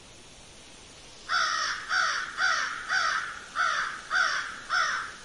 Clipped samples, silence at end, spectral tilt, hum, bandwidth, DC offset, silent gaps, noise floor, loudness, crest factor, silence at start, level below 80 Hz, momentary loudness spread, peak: under 0.1%; 0 s; 1 dB/octave; none; 11.5 kHz; under 0.1%; none; -49 dBFS; -27 LUFS; 16 dB; 0 s; -62 dBFS; 21 LU; -14 dBFS